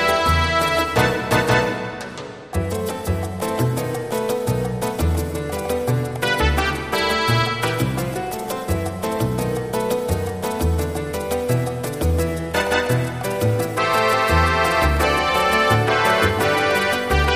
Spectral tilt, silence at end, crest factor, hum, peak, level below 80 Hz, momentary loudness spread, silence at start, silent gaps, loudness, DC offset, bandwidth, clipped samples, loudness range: -5 dB/octave; 0 s; 18 dB; none; -2 dBFS; -32 dBFS; 8 LU; 0 s; none; -20 LUFS; 0.2%; 15.5 kHz; under 0.1%; 6 LU